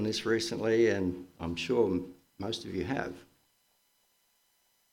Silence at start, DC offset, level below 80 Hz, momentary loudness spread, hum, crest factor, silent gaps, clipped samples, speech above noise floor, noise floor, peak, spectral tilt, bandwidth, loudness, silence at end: 0 s; under 0.1%; -60 dBFS; 15 LU; none; 18 dB; none; under 0.1%; 41 dB; -72 dBFS; -14 dBFS; -5 dB/octave; 16 kHz; -31 LUFS; 1.7 s